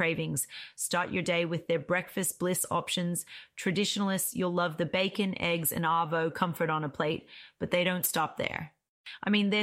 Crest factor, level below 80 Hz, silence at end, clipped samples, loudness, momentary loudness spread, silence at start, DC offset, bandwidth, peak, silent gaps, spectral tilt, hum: 16 dB; -66 dBFS; 0 s; under 0.1%; -30 LUFS; 9 LU; 0 s; under 0.1%; 16 kHz; -14 dBFS; 8.89-9.04 s; -4 dB/octave; none